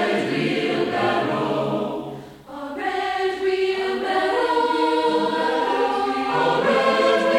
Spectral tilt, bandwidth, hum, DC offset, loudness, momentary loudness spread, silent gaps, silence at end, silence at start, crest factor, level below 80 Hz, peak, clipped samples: -5 dB/octave; 16 kHz; none; under 0.1%; -21 LUFS; 10 LU; none; 0 s; 0 s; 14 dB; -58 dBFS; -6 dBFS; under 0.1%